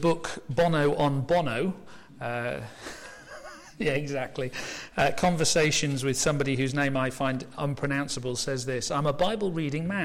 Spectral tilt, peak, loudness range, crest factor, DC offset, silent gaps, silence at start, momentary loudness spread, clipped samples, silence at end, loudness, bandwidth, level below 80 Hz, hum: -4.5 dB/octave; -12 dBFS; 6 LU; 14 dB; under 0.1%; none; 0 s; 15 LU; under 0.1%; 0 s; -27 LUFS; 16 kHz; -50 dBFS; none